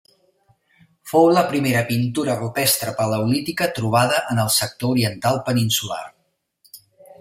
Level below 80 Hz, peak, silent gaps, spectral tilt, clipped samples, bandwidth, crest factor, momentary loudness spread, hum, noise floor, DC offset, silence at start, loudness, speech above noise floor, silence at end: -58 dBFS; -2 dBFS; none; -4.5 dB/octave; under 0.1%; 16 kHz; 18 dB; 6 LU; none; -65 dBFS; under 0.1%; 1.05 s; -19 LUFS; 46 dB; 0.05 s